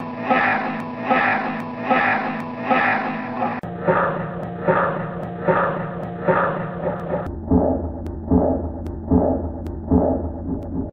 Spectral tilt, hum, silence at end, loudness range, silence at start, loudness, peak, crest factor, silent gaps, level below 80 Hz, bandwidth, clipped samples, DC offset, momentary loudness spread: -9 dB/octave; none; 0 s; 2 LU; 0 s; -21 LUFS; -4 dBFS; 16 dB; none; -36 dBFS; 6 kHz; under 0.1%; under 0.1%; 9 LU